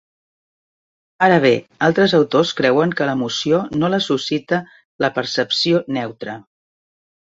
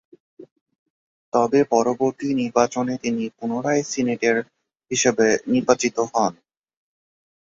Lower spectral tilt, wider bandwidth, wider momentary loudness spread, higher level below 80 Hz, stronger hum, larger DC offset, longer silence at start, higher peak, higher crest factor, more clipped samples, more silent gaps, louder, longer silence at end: about the same, -5 dB/octave vs -4 dB/octave; about the same, 8 kHz vs 7.8 kHz; about the same, 10 LU vs 8 LU; about the same, -58 dBFS vs -62 dBFS; neither; neither; first, 1.2 s vs 0.4 s; about the same, -2 dBFS vs -2 dBFS; about the same, 18 dB vs 20 dB; neither; second, 4.85-4.99 s vs 0.51-0.66 s, 0.79-1.32 s; first, -17 LUFS vs -21 LUFS; second, 0.95 s vs 1.25 s